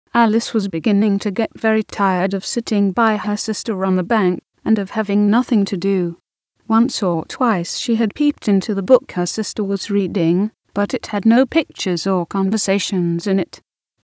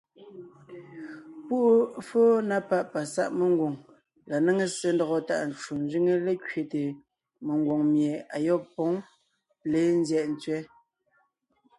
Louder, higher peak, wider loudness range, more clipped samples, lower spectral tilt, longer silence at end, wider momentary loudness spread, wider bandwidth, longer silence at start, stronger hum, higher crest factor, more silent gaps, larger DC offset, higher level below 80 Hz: first, -18 LUFS vs -27 LUFS; first, 0 dBFS vs -12 dBFS; about the same, 1 LU vs 3 LU; neither; about the same, -5.5 dB/octave vs -6 dB/octave; second, 0.5 s vs 1.15 s; second, 6 LU vs 20 LU; second, 8 kHz vs 11.5 kHz; about the same, 0.15 s vs 0.2 s; neither; about the same, 18 dB vs 16 dB; neither; neither; first, -56 dBFS vs -72 dBFS